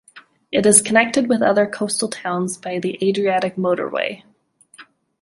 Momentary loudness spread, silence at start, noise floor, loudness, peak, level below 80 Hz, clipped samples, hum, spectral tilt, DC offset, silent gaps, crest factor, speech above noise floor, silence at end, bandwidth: 12 LU; 0.15 s; -54 dBFS; -18 LUFS; 0 dBFS; -62 dBFS; under 0.1%; none; -3.5 dB/octave; under 0.1%; none; 20 dB; 35 dB; 0.4 s; 15 kHz